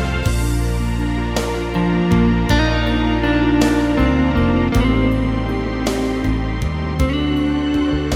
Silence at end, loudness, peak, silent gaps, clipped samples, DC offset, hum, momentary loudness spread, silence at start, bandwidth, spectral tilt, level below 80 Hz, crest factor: 0 s; -18 LUFS; -2 dBFS; none; under 0.1%; under 0.1%; none; 5 LU; 0 s; 16 kHz; -6.5 dB/octave; -24 dBFS; 14 dB